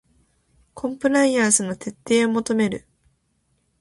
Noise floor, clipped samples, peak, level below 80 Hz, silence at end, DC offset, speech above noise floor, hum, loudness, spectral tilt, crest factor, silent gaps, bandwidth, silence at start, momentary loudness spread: -68 dBFS; under 0.1%; -2 dBFS; -60 dBFS; 1.05 s; under 0.1%; 48 dB; none; -21 LUFS; -3.5 dB/octave; 20 dB; none; 11.5 kHz; 0.75 s; 13 LU